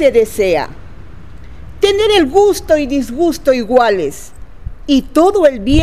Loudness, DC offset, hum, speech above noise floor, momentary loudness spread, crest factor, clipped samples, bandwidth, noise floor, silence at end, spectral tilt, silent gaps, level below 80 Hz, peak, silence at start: -13 LUFS; 3%; none; 22 dB; 14 LU; 14 dB; 0.1%; 15.5 kHz; -34 dBFS; 0 s; -5 dB/octave; none; -32 dBFS; 0 dBFS; 0 s